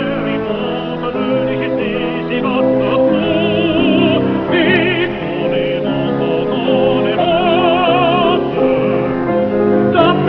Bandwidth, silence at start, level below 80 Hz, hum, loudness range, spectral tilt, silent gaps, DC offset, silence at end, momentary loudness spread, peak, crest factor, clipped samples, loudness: 5.4 kHz; 0 s; -42 dBFS; none; 2 LU; -9 dB/octave; none; under 0.1%; 0 s; 6 LU; 0 dBFS; 14 dB; under 0.1%; -14 LUFS